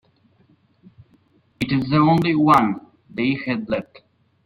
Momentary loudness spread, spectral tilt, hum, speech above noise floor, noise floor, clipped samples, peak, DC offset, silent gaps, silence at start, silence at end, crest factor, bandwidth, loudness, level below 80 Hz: 13 LU; -7.5 dB/octave; none; 40 dB; -59 dBFS; under 0.1%; -2 dBFS; under 0.1%; none; 1.6 s; 0.65 s; 20 dB; 15.5 kHz; -19 LUFS; -54 dBFS